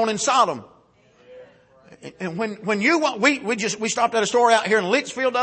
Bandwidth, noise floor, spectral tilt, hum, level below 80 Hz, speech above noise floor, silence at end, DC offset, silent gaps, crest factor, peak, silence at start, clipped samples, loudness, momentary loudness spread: 8.8 kHz; -56 dBFS; -3 dB/octave; none; -70 dBFS; 35 dB; 0 s; under 0.1%; none; 18 dB; -4 dBFS; 0 s; under 0.1%; -20 LUFS; 10 LU